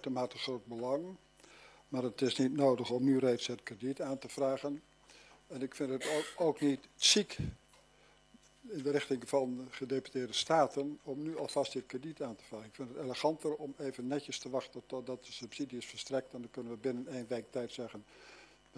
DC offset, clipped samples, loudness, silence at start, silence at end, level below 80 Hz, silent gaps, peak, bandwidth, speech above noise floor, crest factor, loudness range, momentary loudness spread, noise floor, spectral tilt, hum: under 0.1%; under 0.1%; -36 LUFS; 0 s; 0.35 s; -68 dBFS; none; -14 dBFS; 11 kHz; 29 dB; 24 dB; 7 LU; 15 LU; -65 dBFS; -4 dB/octave; none